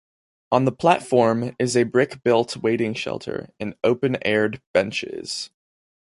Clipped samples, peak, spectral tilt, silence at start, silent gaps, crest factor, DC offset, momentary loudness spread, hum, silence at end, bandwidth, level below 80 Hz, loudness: under 0.1%; -2 dBFS; -5.5 dB/octave; 0.5 s; 4.67-4.74 s; 20 dB; under 0.1%; 11 LU; none; 0.6 s; 11.5 kHz; -58 dBFS; -22 LUFS